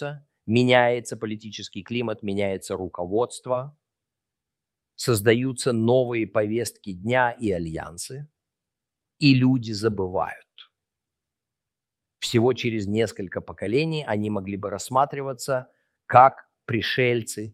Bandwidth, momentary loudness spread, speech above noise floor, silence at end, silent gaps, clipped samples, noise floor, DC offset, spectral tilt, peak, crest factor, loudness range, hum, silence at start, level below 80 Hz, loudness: 15.5 kHz; 15 LU; 64 dB; 0.05 s; none; under 0.1%; -87 dBFS; under 0.1%; -5.5 dB/octave; -2 dBFS; 24 dB; 5 LU; none; 0 s; -60 dBFS; -24 LUFS